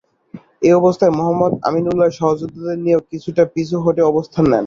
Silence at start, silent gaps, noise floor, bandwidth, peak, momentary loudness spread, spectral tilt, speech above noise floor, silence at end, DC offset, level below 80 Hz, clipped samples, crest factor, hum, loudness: 0.35 s; none; -39 dBFS; 7.4 kHz; -2 dBFS; 6 LU; -8 dB/octave; 24 dB; 0 s; under 0.1%; -50 dBFS; under 0.1%; 14 dB; none; -16 LUFS